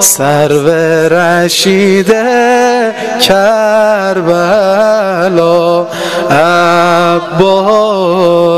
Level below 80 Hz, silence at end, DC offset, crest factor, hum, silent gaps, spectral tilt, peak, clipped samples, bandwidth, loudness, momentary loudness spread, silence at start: -46 dBFS; 0 s; 0.8%; 8 dB; none; none; -4 dB/octave; 0 dBFS; 0.5%; 16.5 kHz; -8 LUFS; 3 LU; 0 s